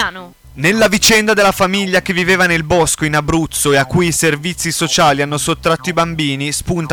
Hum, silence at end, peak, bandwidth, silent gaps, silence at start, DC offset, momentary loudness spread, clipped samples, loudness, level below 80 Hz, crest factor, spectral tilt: none; 0 s; -2 dBFS; 19.5 kHz; none; 0 s; under 0.1%; 7 LU; under 0.1%; -13 LUFS; -36 dBFS; 12 dB; -3.5 dB/octave